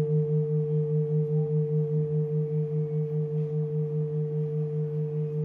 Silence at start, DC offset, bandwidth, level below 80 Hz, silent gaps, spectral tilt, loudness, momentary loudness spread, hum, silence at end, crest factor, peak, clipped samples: 0 s; under 0.1%; 2 kHz; -72 dBFS; none; -13 dB/octave; -28 LUFS; 3 LU; 50 Hz at -60 dBFS; 0 s; 10 dB; -18 dBFS; under 0.1%